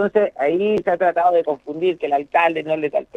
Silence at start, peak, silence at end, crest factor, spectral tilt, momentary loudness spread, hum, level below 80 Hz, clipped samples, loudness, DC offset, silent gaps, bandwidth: 0 s; -4 dBFS; 0.15 s; 14 dB; -7 dB/octave; 5 LU; none; -60 dBFS; under 0.1%; -19 LUFS; under 0.1%; none; 7.8 kHz